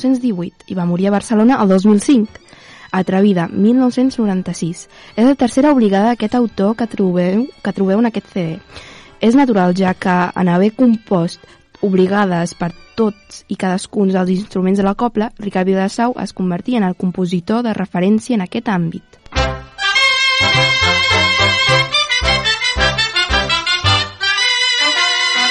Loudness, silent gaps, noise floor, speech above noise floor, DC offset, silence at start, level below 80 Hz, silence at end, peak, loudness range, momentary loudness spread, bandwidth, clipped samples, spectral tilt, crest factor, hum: -14 LUFS; none; -35 dBFS; 20 dB; under 0.1%; 0 s; -36 dBFS; 0 s; -2 dBFS; 6 LU; 10 LU; 11.5 kHz; under 0.1%; -4.5 dB/octave; 14 dB; none